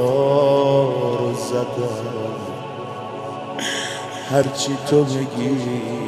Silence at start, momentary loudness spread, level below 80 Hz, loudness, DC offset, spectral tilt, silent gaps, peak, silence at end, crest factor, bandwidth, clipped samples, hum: 0 s; 14 LU; -60 dBFS; -21 LUFS; under 0.1%; -5.5 dB/octave; none; -4 dBFS; 0 s; 18 dB; 14 kHz; under 0.1%; none